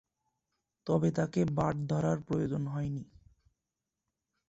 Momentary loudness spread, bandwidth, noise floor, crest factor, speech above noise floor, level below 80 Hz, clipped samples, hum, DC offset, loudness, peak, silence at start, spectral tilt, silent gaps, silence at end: 8 LU; 8 kHz; -89 dBFS; 20 dB; 57 dB; -60 dBFS; under 0.1%; none; under 0.1%; -32 LUFS; -16 dBFS; 0.85 s; -8 dB/octave; none; 1.45 s